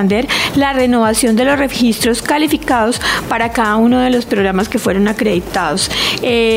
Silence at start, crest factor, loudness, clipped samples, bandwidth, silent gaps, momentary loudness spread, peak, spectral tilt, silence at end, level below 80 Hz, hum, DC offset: 0 s; 12 dB; -13 LUFS; under 0.1%; 16.5 kHz; none; 4 LU; -2 dBFS; -4 dB/octave; 0 s; -36 dBFS; none; under 0.1%